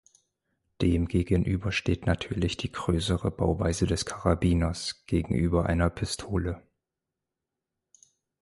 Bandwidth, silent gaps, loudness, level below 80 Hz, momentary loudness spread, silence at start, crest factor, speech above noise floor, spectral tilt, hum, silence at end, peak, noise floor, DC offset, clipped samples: 11.5 kHz; none; -28 LUFS; -38 dBFS; 6 LU; 0.8 s; 18 dB; 60 dB; -6 dB/octave; none; 1.85 s; -10 dBFS; -87 dBFS; under 0.1%; under 0.1%